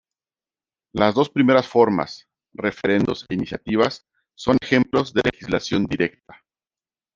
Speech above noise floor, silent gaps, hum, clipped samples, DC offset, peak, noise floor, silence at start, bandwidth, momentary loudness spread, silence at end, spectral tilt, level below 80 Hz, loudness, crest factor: over 70 dB; none; none; under 0.1%; under 0.1%; -2 dBFS; under -90 dBFS; 0.95 s; 7.4 kHz; 11 LU; 1.05 s; -6 dB/octave; -52 dBFS; -21 LUFS; 20 dB